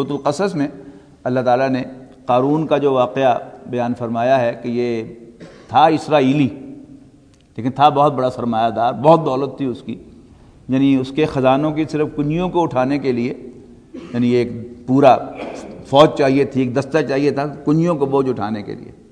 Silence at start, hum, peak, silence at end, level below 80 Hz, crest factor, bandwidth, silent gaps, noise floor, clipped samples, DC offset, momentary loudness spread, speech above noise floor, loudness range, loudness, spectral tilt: 0 s; none; 0 dBFS; 0.2 s; -50 dBFS; 18 dB; 10 kHz; none; -48 dBFS; under 0.1%; under 0.1%; 16 LU; 32 dB; 3 LU; -17 LUFS; -7 dB/octave